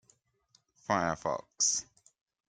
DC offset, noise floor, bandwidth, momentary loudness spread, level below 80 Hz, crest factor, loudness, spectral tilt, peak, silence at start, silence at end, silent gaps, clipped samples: under 0.1%; -71 dBFS; 10.5 kHz; 8 LU; -68 dBFS; 22 dB; -31 LUFS; -2 dB/octave; -14 dBFS; 0.9 s; 0.65 s; none; under 0.1%